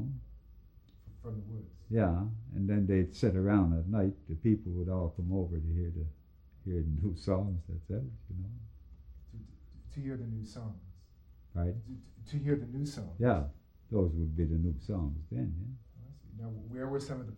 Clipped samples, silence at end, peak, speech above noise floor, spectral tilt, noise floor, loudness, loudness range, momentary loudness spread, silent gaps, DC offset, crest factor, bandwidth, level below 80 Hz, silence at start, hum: under 0.1%; 0 s; -16 dBFS; 25 dB; -9 dB/octave; -58 dBFS; -35 LUFS; 11 LU; 19 LU; none; under 0.1%; 18 dB; 9.4 kHz; -46 dBFS; 0 s; none